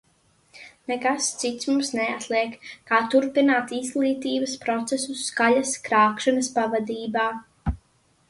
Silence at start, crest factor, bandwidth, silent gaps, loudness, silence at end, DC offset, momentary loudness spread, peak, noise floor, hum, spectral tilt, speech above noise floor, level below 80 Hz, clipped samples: 0.55 s; 18 dB; 11.5 kHz; none; -24 LUFS; 0.55 s; under 0.1%; 11 LU; -6 dBFS; -63 dBFS; none; -3.5 dB/octave; 40 dB; -46 dBFS; under 0.1%